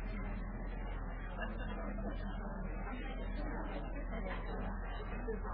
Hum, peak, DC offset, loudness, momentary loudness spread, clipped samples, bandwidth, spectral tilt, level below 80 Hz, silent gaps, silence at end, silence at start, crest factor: none; -30 dBFS; under 0.1%; -44 LUFS; 2 LU; under 0.1%; 4.7 kHz; -6 dB/octave; -42 dBFS; none; 0 s; 0 s; 12 dB